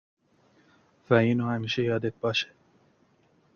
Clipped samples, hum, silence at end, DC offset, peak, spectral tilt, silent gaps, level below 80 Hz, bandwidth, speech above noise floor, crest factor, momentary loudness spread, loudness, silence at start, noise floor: under 0.1%; none; 1.1 s; under 0.1%; -6 dBFS; -6.5 dB/octave; none; -64 dBFS; 7 kHz; 39 dB; 24 dB; 6 LU; -27 LUFS; 1.1 s; -65 dBFS